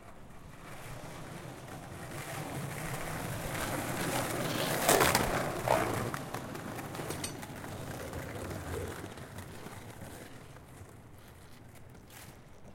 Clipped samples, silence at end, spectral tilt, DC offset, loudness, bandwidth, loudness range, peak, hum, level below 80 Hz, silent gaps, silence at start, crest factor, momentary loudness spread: under 0.1%; 0 s; -3.5 dB/octave; under 0.1%; -35 LUFS; 16.5 kHz; 15 LU; -10 dBFS; none; -54 dBFS; none; 0 s; 28 dB; 22 LU